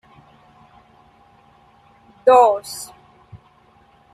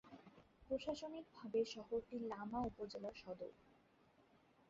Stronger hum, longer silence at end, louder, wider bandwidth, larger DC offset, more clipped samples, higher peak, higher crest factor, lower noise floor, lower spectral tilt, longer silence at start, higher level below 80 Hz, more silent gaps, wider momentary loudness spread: neither; first, 0.8 s vs 0.5 s; first, -16 LUFS vs -47 LUFS; first, 14.5 kHz vs 7.6 kHz; neither; neither; first, -2 dBFS vs -30 dBFS; about the same, 20 dB vs 18 dB; second, -54 dBFS vs -73 dBFS; second, -3 dB/octave vs -4.5 dB/octave; first, 2.25 s vs 0.05 s; first, -62 dBFS vs -72 dBFS; neither; first, 21 LU vs 13 LU